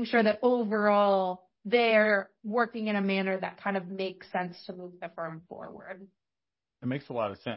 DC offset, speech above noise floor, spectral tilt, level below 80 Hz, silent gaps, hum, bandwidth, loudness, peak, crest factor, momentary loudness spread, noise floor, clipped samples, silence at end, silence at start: under 0.1%; over 61 dB; -9.5 dB/octave; -74 dBFS; none; none; 5.8 kHz; -28 LUFS; -12 dBFS; 18 dB; 20 LU; under -90 dBFS; under 0.1%; 0 s; 0 s